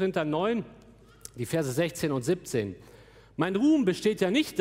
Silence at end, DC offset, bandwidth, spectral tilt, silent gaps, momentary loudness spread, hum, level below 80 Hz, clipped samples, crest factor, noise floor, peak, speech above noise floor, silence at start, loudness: 0 s; under 0.1%; 16 kHz; -5.5 dB/octave; none; 20 LU; none; -60 dBFS; under 0.1%; 18 dB; -50 dBFS; -10 dBFS; 23 dB; 0 s; -28 LUFS